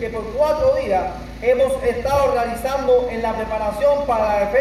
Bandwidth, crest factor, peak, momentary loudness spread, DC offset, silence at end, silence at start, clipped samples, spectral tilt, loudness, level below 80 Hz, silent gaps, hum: 15 kHz; 14 dB; -6 dBFS; 6 LU; under 0.1%; 0 s; 0 s; under 0.1%; -5.5 dB/octave; -19 LUFS; -36 dBFS; none; none